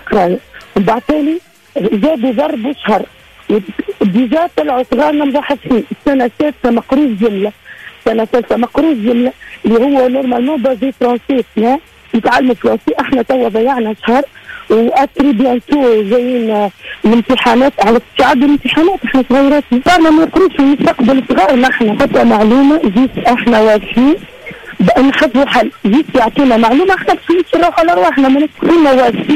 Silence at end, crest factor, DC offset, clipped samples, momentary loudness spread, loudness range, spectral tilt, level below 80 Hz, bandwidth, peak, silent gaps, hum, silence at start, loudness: 0 s; 8 dB; under 0.1%; under 0.1%; 7 LU; 4 LU; -6 dB/octave; -40 dBFS; 13.5 kHz; -2 dBFS; none; none; 0.05 s; -11 LUFS